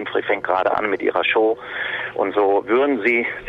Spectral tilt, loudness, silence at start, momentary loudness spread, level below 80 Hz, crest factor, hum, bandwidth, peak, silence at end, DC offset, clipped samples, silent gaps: -6 dB/octave; -19 LUFS; 0 s; 7 LU; -56 dBFS; 16 dB; none; 5.4 kHz; -4 dBFS; 0 s; under 0.1%; under 0.1%; none